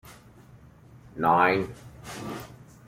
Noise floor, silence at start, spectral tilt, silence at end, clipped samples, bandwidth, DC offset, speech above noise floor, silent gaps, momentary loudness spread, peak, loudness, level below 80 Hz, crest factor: -52 dBFS; 0.05 s; -5.5 dB/octave; 0.25 s; under 0.1%; 16.5 kHz; under 0.1%; 27 dB; none; 23 LU; -8 dBFS; -25 LUFS; -58 dBFS; 20 dB